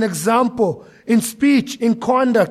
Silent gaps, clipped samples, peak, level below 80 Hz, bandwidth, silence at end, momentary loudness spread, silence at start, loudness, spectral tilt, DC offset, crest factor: none; under 0.1%; -4 dBFS; -58 dBFS; 15.5 kHz; 0 s; 5 LU; 0 s; -17 LUFS; -5 dB/octave; under 0.1%; 14 dB